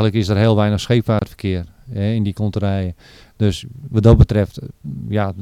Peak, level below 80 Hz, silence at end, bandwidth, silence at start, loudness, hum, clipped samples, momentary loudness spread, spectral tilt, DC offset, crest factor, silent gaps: 0 dBFS; -28 dBFS; 0 s; 11 kHz; 0 s; -18 LUFS; none; under 0.1%; 15 LU; -7.5 dB/octave; under 0.1%; 16 dB; none